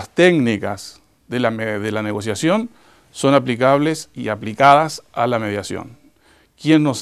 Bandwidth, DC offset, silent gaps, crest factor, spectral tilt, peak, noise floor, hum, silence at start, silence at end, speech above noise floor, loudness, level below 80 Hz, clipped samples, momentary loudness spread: 14 kHz; 0.1%; none; 18 dB; -5.5 dB/octave; 0 dBFS; -55 dBFS; none; 0 s; 0 s; 37 dB; -18 LUFS; -58 dBFS; under 0.1%; 14 LU